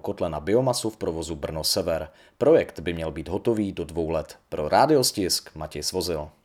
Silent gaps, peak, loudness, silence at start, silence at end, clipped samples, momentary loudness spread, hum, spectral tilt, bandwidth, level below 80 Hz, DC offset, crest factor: none; -4 dBFS; -25 LUFS; 0.05 s; 0.15 s; under 0.1%; 11 LU; none; -4 dB/octave; 18 kHz; -50 dBFS; under 0.1%; 20 dB